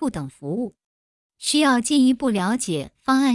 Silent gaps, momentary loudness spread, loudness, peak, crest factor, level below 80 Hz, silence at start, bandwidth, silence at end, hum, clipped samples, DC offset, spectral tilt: 0.85-1.30 s; 11 LU; -21 LUFS; -6 dBFS; 16 dB; -56 dBFS; 0 s; 12 kHz; 0 s; none; under 0.1%; under 0.1%; -4 dB/octave